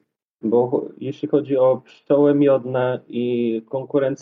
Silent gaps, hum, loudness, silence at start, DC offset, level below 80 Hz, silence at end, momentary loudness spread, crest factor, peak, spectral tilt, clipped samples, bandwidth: none; none; -20 LUFS; 0.45 s; under 0.1%; -70 dBFS; 0 s; 10 LU; 14 dB; -6 dBFS; -8.5 dB/octave; under 0.1%; 4.7 kHz